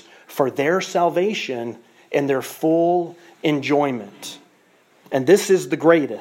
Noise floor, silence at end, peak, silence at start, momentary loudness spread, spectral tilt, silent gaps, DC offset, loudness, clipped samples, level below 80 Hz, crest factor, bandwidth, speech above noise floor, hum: -56 dBFS; 0 s; -2 dBFS; 0.3 s; 16 LU; -5 dB/octave; none; under 0.1%; -20 LUFS; under 0.1%; -74 dBFS; 18 dB; 16.5 kHz; 37 dB; none